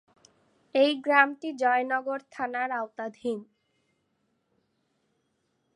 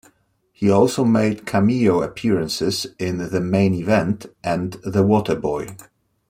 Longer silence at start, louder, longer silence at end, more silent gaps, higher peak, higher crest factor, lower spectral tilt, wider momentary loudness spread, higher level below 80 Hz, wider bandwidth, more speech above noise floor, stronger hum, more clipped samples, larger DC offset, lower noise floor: first, 0.75 s vs 0.6 s; second, -27 LUFS vs -20 LUFS; first, 2.3 s vs 0.45 s; neither; second, -6 dBFS vs -2 dBFS; first, 24 dB vs 18 dB; second, -4 dB/octave vs -6.5 dB/octave; first, 13 LU vs 9 LU; second, -82 dBFS vs -52 dBFS; second, 11 kHz vs 16 kHz; first, 48 dB vs 43 dB; neither; neither; neither; first, -75 dBFS vs -62 dBFS